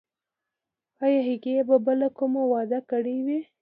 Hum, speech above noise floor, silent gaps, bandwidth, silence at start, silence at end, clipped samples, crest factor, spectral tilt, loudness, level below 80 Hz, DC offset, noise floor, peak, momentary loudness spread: none; 63 dB; none; 4.7 kHz; 1 s; 0.2 s; under 0.1%; 16 dB; -10 dB/octave; -25 LUFS; -80 dBFS; under 0.1%; -87 dBFS; -8 dBFS; 6 LU